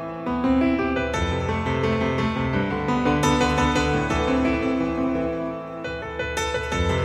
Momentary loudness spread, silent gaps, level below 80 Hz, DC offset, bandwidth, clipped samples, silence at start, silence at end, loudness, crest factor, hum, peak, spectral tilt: 8 LU; none; -36 dBFS; under 0.1%; 13 kHz; under 0.1%; 0 s; 0 s; -23 LUFS; 16 dB; none; -6 dBFS; -5.5 dB/octave